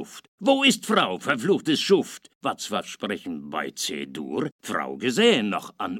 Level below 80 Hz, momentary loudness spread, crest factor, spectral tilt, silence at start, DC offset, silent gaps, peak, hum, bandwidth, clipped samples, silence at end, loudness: -72 dBFS; 12 LU; 18 dB; -3.5 dB/octave; 0 s; under 0.1%; 0.28-0.38 s, 2.35-2.41 s, 4.52-4.59 s; -6 dBFS; none; 16.5 kHz; under 0.1%; 0 s; -24 LUFS